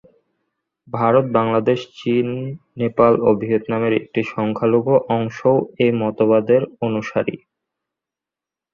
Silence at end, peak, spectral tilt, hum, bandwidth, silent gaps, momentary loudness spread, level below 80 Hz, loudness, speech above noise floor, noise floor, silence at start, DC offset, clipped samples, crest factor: 1.35 s; -2 dBFS; -8 dB/octave; none; 7 kHz; none; 9 LU; -58 dBFS; -18 LUFS; 70 dB; -88 dBFS; 0.95 s; under 0.1%; under 0.1%; 18 dB